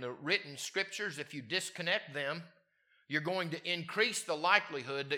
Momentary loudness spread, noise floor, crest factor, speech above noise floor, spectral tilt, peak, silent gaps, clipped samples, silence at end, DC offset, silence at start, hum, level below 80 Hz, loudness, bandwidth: 10 LU; -73 dBFS; 26 dB; 37 dB; -3 dB/octave; -10 dBFS; none; under 0.1%; 0 s; under 0.1%; 0 s; none; under -90 dBFS; -34 LUFS; 17.5 kHz